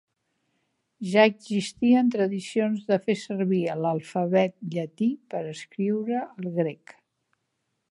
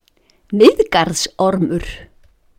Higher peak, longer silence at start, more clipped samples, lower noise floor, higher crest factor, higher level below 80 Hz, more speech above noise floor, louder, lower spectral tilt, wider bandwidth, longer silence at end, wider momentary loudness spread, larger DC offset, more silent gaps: second, -4 dBFS vs 0 dBFS; first, 1 s vs 0.5 s; neither; first, -78 dBFS vs -56 dBFS; first, 22 dB vs 16 dB; second, -74 dBFS vs -40 dBFS; first, 53 dB vs 42 dB; second, -26 LUFS vs -15 LUFS; first, -6.5 dB/octave vs -4.5 dB/octave; second, 11.5 kHz vs 16.5 kHz; first, 1.15 s vs 0.55 s; second, 12 LU vs 16 LU; neither; neither